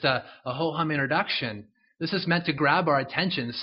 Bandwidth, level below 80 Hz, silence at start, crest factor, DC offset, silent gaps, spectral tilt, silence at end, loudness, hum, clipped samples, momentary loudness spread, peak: 5.8 kHz; -64 dBFS; 0 s; 20 dB; under 0.1%; none; -3 dB/octave; 0 s; -26 LUFS; none; under 0.1%; 11 LU; -6 dBFS